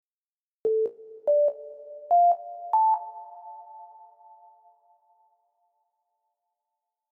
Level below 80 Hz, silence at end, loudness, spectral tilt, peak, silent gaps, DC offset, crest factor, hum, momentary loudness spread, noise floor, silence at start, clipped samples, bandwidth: -88 dBFS; 3.3 s; -25 LUFS; -7.5 dB/octave; -14 dBFS; none; under 0.1%; 16 dB; none; 23 LU; under -90 dBFS; 0.65 s; under 0.1%; 1.9 kHz